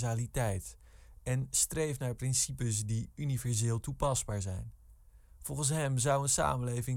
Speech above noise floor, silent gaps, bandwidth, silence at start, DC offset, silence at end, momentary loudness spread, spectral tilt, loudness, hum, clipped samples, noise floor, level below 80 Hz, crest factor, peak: 25 dB; none; 17 kHz; 0 s; under 0.1%; 0 s; 11 LU; -4.5 dB/octave; -33 LUFS; none; under 0.1%; -58 dBFS; -50 dBFS; 18 dB; -16 dBFS